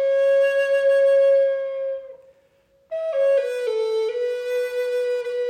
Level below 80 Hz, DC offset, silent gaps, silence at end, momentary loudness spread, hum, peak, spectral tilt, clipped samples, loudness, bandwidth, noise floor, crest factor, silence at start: -76 dBFS; under 0.1%; none; 0 s; 11 LU; none; -12 dBFS; -0.5 dB/octave; under 0.1%; -21 LUFS; 9.4 kHz; -60 dBFS; 10 dB; 0 s